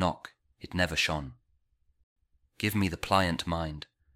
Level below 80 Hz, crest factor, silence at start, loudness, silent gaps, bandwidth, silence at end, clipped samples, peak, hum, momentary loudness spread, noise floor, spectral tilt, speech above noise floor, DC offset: -50 dBFS; 24 dB; 0 s; -30 LUFS; 2.03-2.16 s; 16 kHz; 0.3 s; under 0.1%; -10 dBFS; none; 18 LU; -71 dBFS; -4.5 dB/octave; 41 dB; under 0.1%